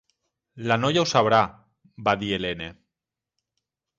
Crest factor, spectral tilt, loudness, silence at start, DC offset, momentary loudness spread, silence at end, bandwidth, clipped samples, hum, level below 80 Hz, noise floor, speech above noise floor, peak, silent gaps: 20 dB; -4.5 dB/octave; -23 LUFS; 0.55 s; under 0.1%; 14 LU; 1.25 s; 8 kHz; under 0.1%; none; -56 dBFS; -88 dBFS; 65 dB; -6 dBFS; none